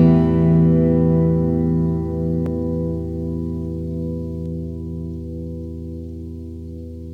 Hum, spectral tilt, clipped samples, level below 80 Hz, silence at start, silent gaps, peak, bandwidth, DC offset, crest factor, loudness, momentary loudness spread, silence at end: none; -11.5 dB/octave; under 0.1%; -34 dBFS; 0 s; none; -4 dBFS; 3.2 kHz; under 0.1%; 16 dB; -20 LUFS; 17 LU; 0 s